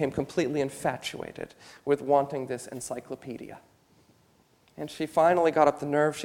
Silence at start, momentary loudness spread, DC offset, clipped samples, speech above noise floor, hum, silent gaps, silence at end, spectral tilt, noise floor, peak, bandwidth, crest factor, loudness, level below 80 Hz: 0 s; 18 LU; under 0.1%; under 0.1%; 36 dB; none; none; 0 s; -5.5 dB/octave; -64 dBFS; -6 dBFS; 17 kHz; 22 dB; -27 LUFS; -62 dBFS